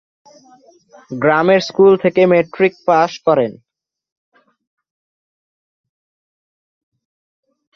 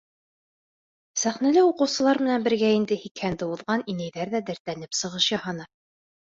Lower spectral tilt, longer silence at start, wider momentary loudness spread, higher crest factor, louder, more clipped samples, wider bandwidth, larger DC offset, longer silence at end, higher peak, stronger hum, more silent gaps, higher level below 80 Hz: first, -6.5 dB/octave vs -4 dB/octave; about the same, 1.1 s vs 1.15 s; second, 6 LU vs 12 LU; about the same, 18 dB vs 16 dB; first, -14 LUFS vs -25 LUFS; neither; second, 6.6 kHz vs 7.8 kHz; neither; first, 4.25 s vs 0.65 s; first, 0 dBFS vs -8 dBFS; neither; second, none vs 3.11-3.15 s, 4.60-4.65 s; about the same, -60 dBFS vs -64 dBFS